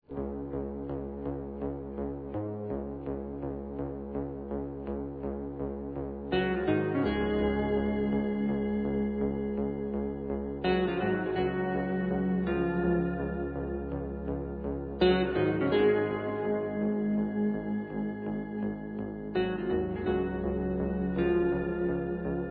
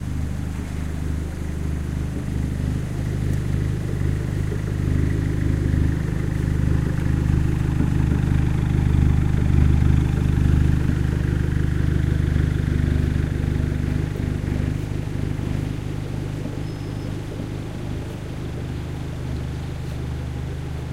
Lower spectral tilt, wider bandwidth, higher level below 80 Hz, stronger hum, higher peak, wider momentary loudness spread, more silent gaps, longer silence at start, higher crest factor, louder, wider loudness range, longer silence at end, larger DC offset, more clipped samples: first, -11 dB/octave vs -8 dB/octave; second, 4.8 kHz vs 12.5 kHz; second, -46 dBFS vs -26 dBFS; second, none vs 50 Hz at -35 dBFS; second, -14 dBFS vs -4 dBFS; about the same, 9 LU vs 10 LU; neither; about the same, 0.1 s vs 0 s; about the same, 16 dB vs 18 dB; second, -31 LUFS vs -23 LUFS; about the same, 8 LU vs 10 LU; about the same, 0 s vs 0 s; neither; neither